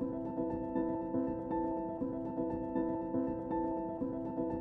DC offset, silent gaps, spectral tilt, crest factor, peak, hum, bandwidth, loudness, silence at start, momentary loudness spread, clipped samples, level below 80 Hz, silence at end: under 0.1%; none; -11.5 dB/octave; 14 dB; -22 dBFS; none; 3.8 kHz; -37 LUFS; 0 s; 2 LU; under 0.1%; -58 dBFS; 0 s